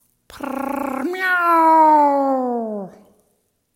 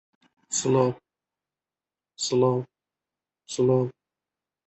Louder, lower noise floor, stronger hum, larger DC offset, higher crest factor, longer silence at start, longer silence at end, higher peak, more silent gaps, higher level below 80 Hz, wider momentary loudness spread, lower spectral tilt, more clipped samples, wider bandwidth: first, -17 LUFS vs -25 LUFS; second, -67 dBFS vs under -90 dBFS; neither; neither; about the same, 14 dB vs 18 dB; second, 0.35 s vs 0.5 s; about the same, 0.85 s vs 0.75 s; first, -4 dBFS vs -10 dBFS; neither; about the same, -62 dBFS vs -66 dBFS; first, 18 LU vs 13 LU; about the same, -5 dB/octave vs -5.5 dB/octave; neither; first, 16.5 kHz vs 8.6 kHz